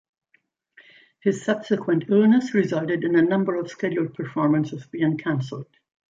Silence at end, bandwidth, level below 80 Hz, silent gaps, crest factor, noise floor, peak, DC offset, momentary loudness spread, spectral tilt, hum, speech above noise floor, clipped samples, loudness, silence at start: 0.5 s; 7.8 kHz; -68 dBFS; none; 16 dB; -67 dBFS; -8 dBFS; under 0.1%; 9 LU; -7.5 dB/octave; none; 45 dB; under 0.1%; -23 LUFS; 1.25 s